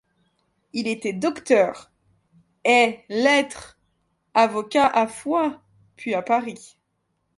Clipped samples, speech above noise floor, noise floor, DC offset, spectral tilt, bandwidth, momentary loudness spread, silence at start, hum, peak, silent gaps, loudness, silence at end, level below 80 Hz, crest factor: under 0.1%; 52 dB; -73 dBFS; under 0.1%; -3.5 dB/octave; 11.5 kHz; 14 LU; 0.75 s; none; -4 dBFS; none; -21 LUFS; 0.7 s; -66 dBFS; 20 dB